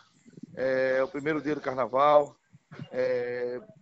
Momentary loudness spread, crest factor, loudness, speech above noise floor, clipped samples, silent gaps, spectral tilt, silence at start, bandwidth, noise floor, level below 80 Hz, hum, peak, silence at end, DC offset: 15 LU; 20 dB; -28 LUFS; 23 dB; under 0.1%; none; -6.5 dB/octave; 0.55 s; 8 kHz; -50 dBFS; -68 dBFS; none; -8 dBFS; 0.15 s; under 0.1%